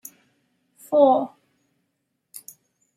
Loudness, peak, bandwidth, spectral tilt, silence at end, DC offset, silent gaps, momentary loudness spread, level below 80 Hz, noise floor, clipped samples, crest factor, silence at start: -19 LUFS; -4 dBFS; 15.5 kHz; -5.5 dB/octave; 1.7 s; under 0.1%; none; 26 LU; -80 dBFS; -76 dBFS; under 0.1%; 22 dB; 0.9 s